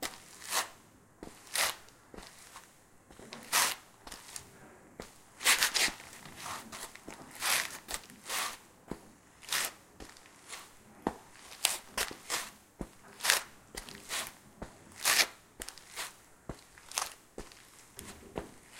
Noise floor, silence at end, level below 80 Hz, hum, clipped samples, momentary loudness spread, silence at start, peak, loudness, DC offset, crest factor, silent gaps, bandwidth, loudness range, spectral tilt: -60 dBFS; 0 s; -62 dBFS; none; under 0.1%; 23 LU; 0 s; -2 dBFS; -33 LUFS; under 0.1%; 36 dB; none; 17 kHz; 7 LU; 0 dB/octave